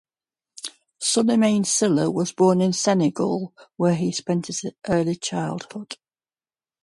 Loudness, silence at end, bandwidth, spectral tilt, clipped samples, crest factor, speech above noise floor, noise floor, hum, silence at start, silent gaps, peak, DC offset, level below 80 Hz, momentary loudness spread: -22 LUFS; 0.9 s; 11.5 kHz; -5 dB/octave; under 0.1%; 16 dB; over 68 dB; under -90 dBFS; none; 0.65 s; none; -8 dBFS; under 0.1%; -60 dBFS; 17 LU